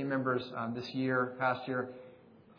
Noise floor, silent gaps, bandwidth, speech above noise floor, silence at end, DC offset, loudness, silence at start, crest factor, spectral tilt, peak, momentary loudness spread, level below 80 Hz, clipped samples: -58 dBFS; none; 5.4 kHz; 24 dB; 0.05 s; under 0.1%; -34 LUFS; 0 s; 18 dB; -4.5 dB/octave; -18 dBFS; 7 LU; -76 dBFS; under 0.1%